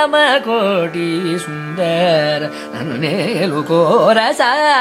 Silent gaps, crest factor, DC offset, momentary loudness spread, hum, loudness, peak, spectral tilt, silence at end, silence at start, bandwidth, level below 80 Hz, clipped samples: none; 14 dB; under 0.1%; 10 LU; none; -15 LUFS; 0 dBFS; -5 dB/octave; 0 s; 0 s; 15.5 kHz; -66 dBFS; under 0.1%